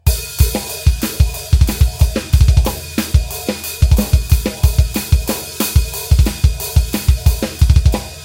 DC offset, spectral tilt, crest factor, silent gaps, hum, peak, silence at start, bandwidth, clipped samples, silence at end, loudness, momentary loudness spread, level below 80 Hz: under 0.1%; -5 dB/octave; 14 dB; none; none; 0 dBFS; 0.05 s; 17 kHz; 0.2%; 0 s; -16 LUFS; 5 LU; -16 dBFS